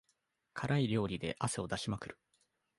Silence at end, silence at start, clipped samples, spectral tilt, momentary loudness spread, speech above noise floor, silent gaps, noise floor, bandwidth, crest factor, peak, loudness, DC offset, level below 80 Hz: 0.65 s; 0.55 s; under 0.1%; -5.5 dB/octave; 12 LU; 44 dB; none; -80 dBFS; 11.5 kHz; 20 dB; -18 dBFS; -37 LUFS; under 0.1%; -62 dBFS